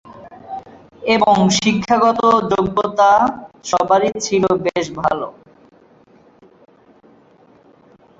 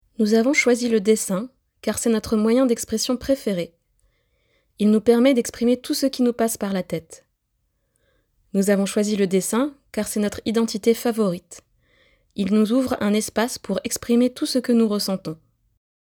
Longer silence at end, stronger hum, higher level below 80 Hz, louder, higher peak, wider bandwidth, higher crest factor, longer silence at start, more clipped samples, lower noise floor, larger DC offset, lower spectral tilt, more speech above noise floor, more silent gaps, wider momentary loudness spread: first, 2.9 s vs 0.7 s; neither; about the same, -52 dBFS vs -54 dBFS; first, -16 LUFS vs -21 LUFS; about the same, -2 dBFS vs -4 dBFS; second, 8.2 kHz vs 19 kHz; about the same, 16 dB vs 18 dB; about the same, 0.1 s vs 0.2 s; neither; second, -50 dBFS vs -72 dBFS; neither; about the same, -4.5 dB/octave vs -4.5 dB/octave; second, 35 dB vs 51 dB; neither; first, 18 LU vs 10 LU